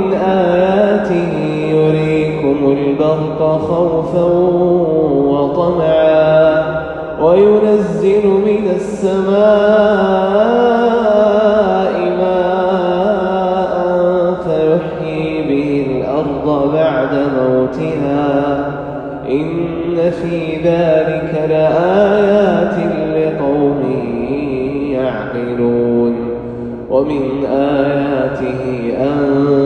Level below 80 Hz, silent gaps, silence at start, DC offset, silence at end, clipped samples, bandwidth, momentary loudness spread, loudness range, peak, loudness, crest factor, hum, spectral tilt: -40 dBFS; none; 0 s; under 0.1%; 0 s; under 0.1%; 9.2 kHz; 8 LU; 5 LU; 0 dBFS; -14 LUFS; 12 dB; none; -8 dB/octave